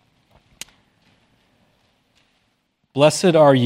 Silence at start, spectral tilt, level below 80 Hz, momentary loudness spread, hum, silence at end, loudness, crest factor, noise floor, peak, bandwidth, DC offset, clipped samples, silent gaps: 2.95 s; -5.5 dB/octave; -66 dBFS; 25 LU; none; 0 s; -16 LUFS; 20 dB; -68 dBFS; 0 dBFS; 15.5 kHz; under 0.1%; under 0.1%; none